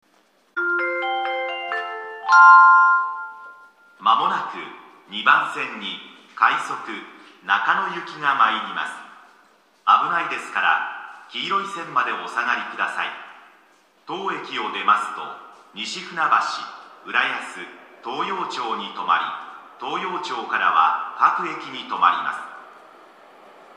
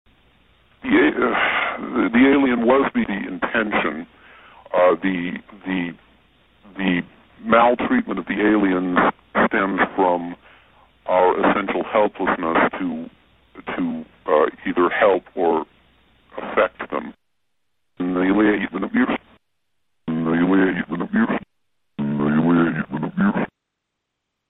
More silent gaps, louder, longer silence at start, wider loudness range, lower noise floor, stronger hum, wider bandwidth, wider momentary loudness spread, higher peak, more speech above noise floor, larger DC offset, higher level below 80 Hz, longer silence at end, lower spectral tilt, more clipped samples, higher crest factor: neither; about the same, -20 LUFS vs -20 LUFS; second, 0.55 s vs 0.85 s; first, 9 LU vs 5 LU; second, -60 dBFS vs -79 dBFS; neither; first, 10.5 kHz vs 4 kHz; first, 17 LU vs 14 LU; about the same, 0 dBFS vs -2 dBFS; second, 38 dB vs 59 dB; neither; second, -88 dBFS vs -54 dBFS; about the same, 1 s vs 1.05 s; second, -2.5 dB/octave vs -10 dB/octave; neither; about the same, 22 dB vs 18 dB